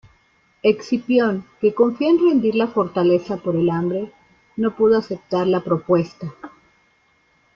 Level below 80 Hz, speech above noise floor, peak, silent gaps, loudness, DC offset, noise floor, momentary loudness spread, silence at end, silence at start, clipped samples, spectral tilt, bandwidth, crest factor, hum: -58 dBFS; 42 dB; -4 dBFS; none; -19 LUFS; under 0.1%; -61 dBFS; 9 LU; 1.1 s; 0.65 s; under 0.1%; -8 dB/octave; 6.8 kHz; 16 dB; none